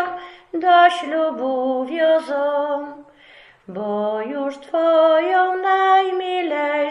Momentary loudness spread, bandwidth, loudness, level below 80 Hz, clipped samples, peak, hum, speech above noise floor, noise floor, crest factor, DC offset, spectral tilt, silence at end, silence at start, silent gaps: 13 LU; 11 kHz; -18 LUFS; -70 dBFS; under 0.1%; -2 dBFS; none; 30 dB; -48 dBFS; 18 dB; under 0.1%; -5 dB/octave; 0 s; 0 s; none